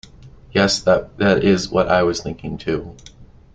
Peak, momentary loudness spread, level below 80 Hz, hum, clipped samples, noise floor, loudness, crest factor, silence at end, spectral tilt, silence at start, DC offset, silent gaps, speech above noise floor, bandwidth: -2 dBFS; 11 LU; -42 dBFS; none; under 0.1%; -43 dBFS; -18 LUFS; 18 dB; 0.3 s; -5 dB/octave; 0.25 s; under 0.1%; none; 25 dB; 9.2 kHz